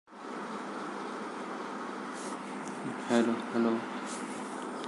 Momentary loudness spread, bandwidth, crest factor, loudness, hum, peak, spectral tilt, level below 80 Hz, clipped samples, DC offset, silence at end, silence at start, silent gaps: 10 LU; 11.5 kHz; 22 dB; -35 LUFS; none; -14 dBFS; -4.5 dB/octave; -84 dBFS; under 0.1%; under 0.1%; 0 s; 0.1 s; none